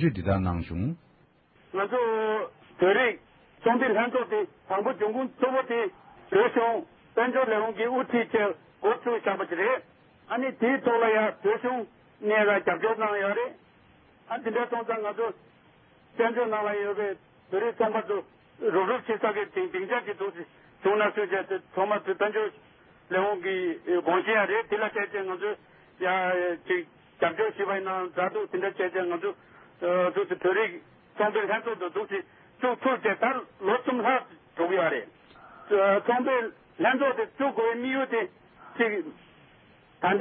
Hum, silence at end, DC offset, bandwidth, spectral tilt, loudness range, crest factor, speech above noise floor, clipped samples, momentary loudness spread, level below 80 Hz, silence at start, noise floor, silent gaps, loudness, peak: none; 0 s; under 0.1%; 4.4 kHz; -10 dB/octave; 3 LU; 18 dB; 34 dB; under 0.1%; 10 LU; -56 dBFS; 0 s; -61 dBFS; none; -27 LUFS; -10 dBFS